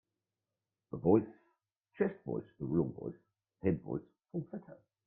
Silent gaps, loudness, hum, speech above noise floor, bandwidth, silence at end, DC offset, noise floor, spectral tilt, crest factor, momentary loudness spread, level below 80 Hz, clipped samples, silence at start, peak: none; -36 LUFS; none; over 55 dB; 3.3 kHz; 0.35 s; under 0.1%; under -90 dBFS; -12.5 dB/octave; 22 dB; 17 LU; -68 dBFS; under 0.1%; 0.95 s; -14 dBFS